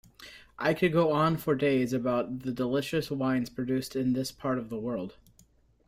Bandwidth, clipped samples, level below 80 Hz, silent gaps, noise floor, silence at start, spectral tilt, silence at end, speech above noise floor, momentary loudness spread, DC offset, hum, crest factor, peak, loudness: 16 kHz; under 0.1%; -60 dBFS; none; -63 dBFS; 0.2 s; -6.5 dB/octave; 0.75 s; 34 dB; 10 LU; under 0.1%; none; 16 dB; -14 dBFS; -29 LUFS